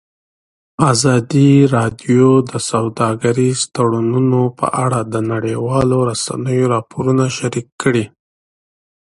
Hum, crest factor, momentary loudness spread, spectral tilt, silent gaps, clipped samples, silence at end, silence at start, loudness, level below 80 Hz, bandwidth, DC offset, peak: none; 16 dB; 8 LU; -6 dB/octave; 7.72-7.79 s; under 0.1%; 1.1 s; 0.8 s; -15 LUFS; -48 dBFS; 11.5 kHz; under 0.1%; 0 dBFS